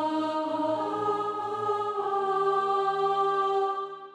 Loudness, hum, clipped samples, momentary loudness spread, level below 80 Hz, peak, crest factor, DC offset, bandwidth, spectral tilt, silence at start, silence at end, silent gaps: -28 LUFS; none; under 0.1%; 4 LU; -82 dBFS; -16 dBFS; 12 dB; under 0.1%; 10.5 kHz; -5.5 dB/octave; 0 s; 0 s; none